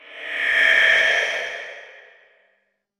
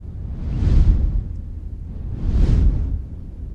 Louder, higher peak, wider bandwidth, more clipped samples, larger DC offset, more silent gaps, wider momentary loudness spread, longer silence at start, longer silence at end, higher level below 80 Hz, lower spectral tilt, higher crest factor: first, -17 LUFS vs -22 LUFS; about the same, -2 dBFS vs -4 dBFS; first, 13 kHz vs 5.6 kHz; neither; neither; neither; about the same, 17 LU vs 15 LU; about the same, 0.1 s vs 0 s; first, 1.1 s vs 0 s; second, -62 dBFS vs -20 dBFS; second, 0.5 dB/octave vs -9.5 dB/octave; first, 20 dB vs 14 dB